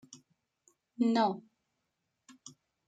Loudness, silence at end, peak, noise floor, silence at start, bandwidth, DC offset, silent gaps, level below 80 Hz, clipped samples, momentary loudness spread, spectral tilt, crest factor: -31 LUFS; 0.4 s; -16 dBFS; -84 dBFS; 1 s; 9 kHz; under 0.1%; none; -86 dBFS; under 0.1%; 25 LU; -5.5 dB/octave; 20 dB